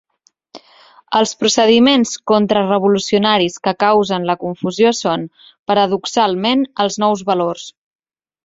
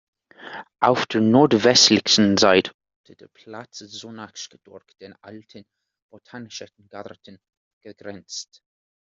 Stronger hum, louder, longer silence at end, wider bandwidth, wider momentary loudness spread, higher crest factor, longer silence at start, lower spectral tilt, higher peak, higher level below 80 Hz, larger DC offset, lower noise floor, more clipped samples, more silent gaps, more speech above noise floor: neither; about the same, -15 LUFS vs -16 LUFS; about the same, 0.75 s vs 0.65 s; about the same, 7.8 kHz vs 7.8 kHz; second, 9 LU vs 26 LU; second, 16 dB vs 22 dB; about the same, 0.55 s vs 0.45 s; about the same, -4 dB/octave vs -3.5 dB/octave; about the same, 0 dBFS vs -2 dBFS; first, -58 dBFS vs -64 dBFS; neither; first, -60 dBFS vs -39 dBFS; neither; second, 5.59-5.66 s vs 2.74-2.79 s, 2.96-3.04 s, 6.02-6.09 s, 7.57-7.81 s; first, 45 dB vs 18 dB